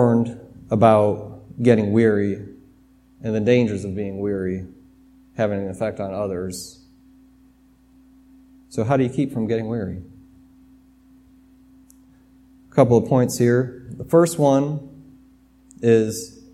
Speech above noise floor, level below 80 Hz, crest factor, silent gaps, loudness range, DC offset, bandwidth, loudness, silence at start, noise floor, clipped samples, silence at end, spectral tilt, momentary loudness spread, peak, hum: 35 dB; -54 dBFS; 22 dB; none; 9 LU; under 0.1%; 15 kHz; -21 LUFS; 0 s; -54 dBFS; under 0.1%; 0.25 s; -7 dB/octave; 16 LU; 0 dBFS; none